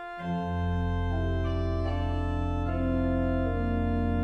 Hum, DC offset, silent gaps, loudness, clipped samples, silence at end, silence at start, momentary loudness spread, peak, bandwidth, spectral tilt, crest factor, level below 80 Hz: none; under 0.1%; none; -30 LUFS; under 0.1%; 0 s; 0 s; 3 LU; -16 dBFS; 6.2 kHz; -9 dB/octave; 12 dB; -36 dBFS